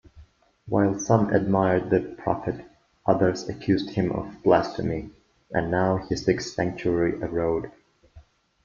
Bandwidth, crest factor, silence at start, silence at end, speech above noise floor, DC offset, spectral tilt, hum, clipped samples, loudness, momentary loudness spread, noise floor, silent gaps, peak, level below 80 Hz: 7.4 kHz; 22 dB; 0.15 s; 0.45 s; 29 dB; under 0.1%; -6.5 dB/octave; none; under 0.1%; -25 LUFS; 9 LU; -53 dBFS; none; -2 dBFS; -50 dBFS